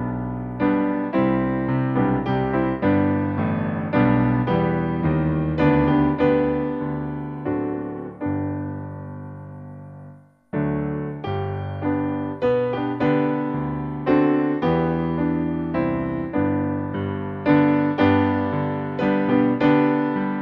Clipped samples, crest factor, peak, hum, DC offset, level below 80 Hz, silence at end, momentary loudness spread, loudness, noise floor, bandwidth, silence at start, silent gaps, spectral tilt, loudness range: under 0.1%; 16 dB; -4 dBFS; none; under 0.1%; -44 dBFS; 0 s; 11 LU; -22 LUFS; -45 dBFS; 5.2 kHz; 0 s; none; -10 dB/octave; 9 LU